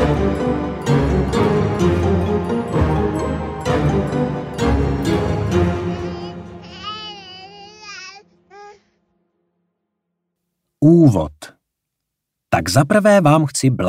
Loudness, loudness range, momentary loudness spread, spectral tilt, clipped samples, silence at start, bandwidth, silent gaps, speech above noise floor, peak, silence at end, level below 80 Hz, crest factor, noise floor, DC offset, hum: -17 LUFS; 18 LU; 21 LU; -6.5 dB/octave; under 0.1%; 0 s; 15.5 kHz; none; 66 dB; -2 dBFS; 0 s; -32 dBFS; 16 dB; -79 dBFS; under 0.1%; none